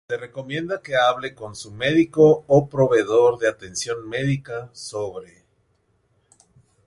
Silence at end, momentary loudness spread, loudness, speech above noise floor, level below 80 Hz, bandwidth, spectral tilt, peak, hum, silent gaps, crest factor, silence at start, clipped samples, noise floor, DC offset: 1.65 s; 16 LU; -21 LUFS; 45 dB; -56 dBFS; 11.5 kHz; -5.5 dB/octave; -4 dBFS; none; none; 18 dB; 0.1 s; under 0.1%; -66 dBFS; under 0.1%